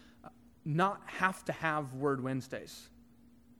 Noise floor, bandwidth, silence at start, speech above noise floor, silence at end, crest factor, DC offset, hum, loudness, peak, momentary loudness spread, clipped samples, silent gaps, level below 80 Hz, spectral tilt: -61 dBFS; 18.5 kHz; 0.05 s; 27 dB; 0.7 s; 24 dB; under 0.1%; none; -34 LUFS; -12 dBFS; 14 LU; under 0.1%; none; -68 dBFS; -6 dB/octave